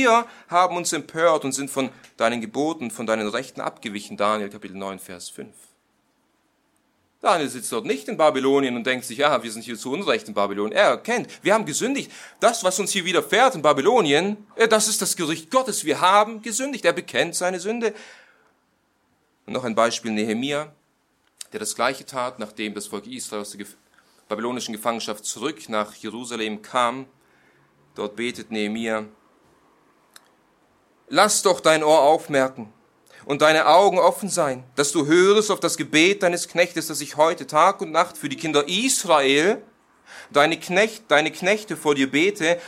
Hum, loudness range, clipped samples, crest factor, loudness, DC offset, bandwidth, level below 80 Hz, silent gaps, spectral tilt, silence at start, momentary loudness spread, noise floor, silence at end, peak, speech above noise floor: none; 11 LU; under 0.1%; 20 dB; -21 LUFS; under 0.1%; 16.5 kHz; -70 dBFS; none; -3 dB/octave; 0 s; 14 LU; -67 dBFS; 0 s; -2 dBFS; 45 dB